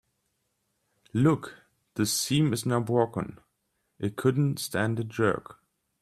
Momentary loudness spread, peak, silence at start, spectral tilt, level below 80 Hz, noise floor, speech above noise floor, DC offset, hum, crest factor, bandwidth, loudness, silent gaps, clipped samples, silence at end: 11 LU; -10 dBFS; 1.15 s; -5.5 dB/octave; -62 dBFS; -77 dBFS; 50 dB; under 0.1%; none; 20 dB; 15.5 kHz; -27 LUFS; none; under 0.1%; 0.5 s